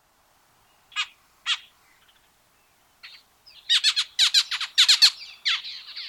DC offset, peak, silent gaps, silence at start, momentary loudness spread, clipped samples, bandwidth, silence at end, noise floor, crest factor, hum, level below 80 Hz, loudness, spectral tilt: under 0.1%; -4 dBFS; none; 0.95 s; 17 LU; under 0.1%; 18 kHz; 0 s; -62 dBFS; 22 dB; none; -76 dBFS; -20 LUFS; 6 dB/octave